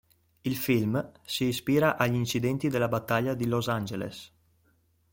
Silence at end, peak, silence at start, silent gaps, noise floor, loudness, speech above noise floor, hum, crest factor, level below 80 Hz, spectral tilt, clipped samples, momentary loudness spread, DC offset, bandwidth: 0.85 s; -8 dBFS; 0.45 s; none; -68 dBFS; -28 LUFS; 40 dB; none; 20 dB; -60 dBFS; -5.5 dB/octave; under 0.1%; 10 LU; under 0.1%; 17 kHz